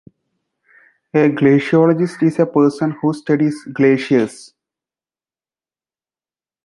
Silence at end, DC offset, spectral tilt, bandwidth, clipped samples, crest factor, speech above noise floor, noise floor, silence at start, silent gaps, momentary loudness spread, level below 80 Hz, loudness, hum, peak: 2.3 s; under 0.1%; -7.5 dB/octave; 11.5 kHz; under 0.1%; 16 dB; over 75 dB; under -90 dBFS; 1.15 s; none; 7 LU; -64 dBFS; -16 LUFS; none; -2 dBFS